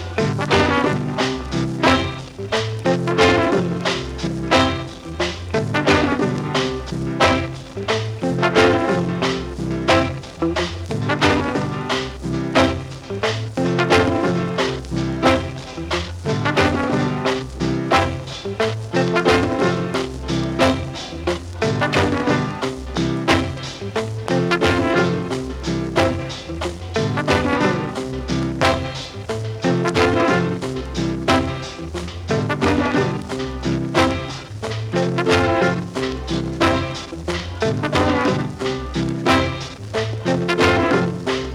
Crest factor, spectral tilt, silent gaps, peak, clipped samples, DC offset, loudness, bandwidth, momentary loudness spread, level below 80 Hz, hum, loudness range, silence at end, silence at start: 20 dB; -5.5 dB/octave; none; 0 dBFS; under 0.1%; under 0.1%; -20 LUFS; 15.5 kHz; 10 LU; -38 dBFS; none; 2 LU; 0 s; 0 s